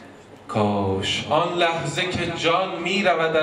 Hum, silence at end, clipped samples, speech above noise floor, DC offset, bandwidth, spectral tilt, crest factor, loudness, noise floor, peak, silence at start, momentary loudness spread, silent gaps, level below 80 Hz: none; 0 s; under 0.1%; 22 dB; under 0.1%; 12 kHz; -4.5 dB/octave; 16 dB; -22 LUFS; -43 dBFS; -6 dBFS; 0 s; 4 LU; none; -56 dBFS